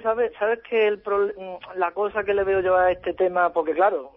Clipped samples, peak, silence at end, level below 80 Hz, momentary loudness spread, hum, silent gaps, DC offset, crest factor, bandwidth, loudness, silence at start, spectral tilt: under 0.1%; -8 dBFS; 0.05 s; -54 dBFS; 7 LU; none; none; under 0.1%; 14 dB; 5.4 kHz; -23 LUFS; 0 s; -8.5 dB/octave